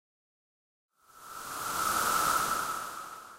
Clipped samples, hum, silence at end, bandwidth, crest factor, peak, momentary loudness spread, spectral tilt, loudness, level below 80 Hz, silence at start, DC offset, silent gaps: under 0.1%; none; 0 s; 16 kHz; 18 dB; -16 dBFS; 16 LU; -1 dB/octave; -30 LUFS; -62 dBFS; 1.15 s; under 0.1%; none